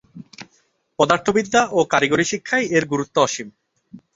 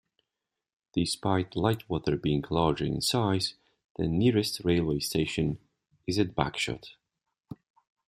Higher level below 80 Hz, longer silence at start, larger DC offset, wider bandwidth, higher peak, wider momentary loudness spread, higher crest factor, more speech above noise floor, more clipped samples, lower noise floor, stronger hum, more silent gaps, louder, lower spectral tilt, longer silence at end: second, -58 dBFS vs -52 dBFS; second, 0.15 s vs 0.95 s; neither; second, 8 kHz vs 15.5 kHz; first, -2 dBFS vs -8 dBFS; first, 21 LU vs 15 LU; about the same, 18 dB vs 22 dB; second, 45 dB vs 60 dB; neither; second, -63 dBFS vs -88 dBFS; neither; second, none vs 3.85-3.95 s; first, -19 LUFS vs -29 LUFS; second, -4 dB/octave vs -5.5 dB/octave; second, 0.2 s vs 0.55 s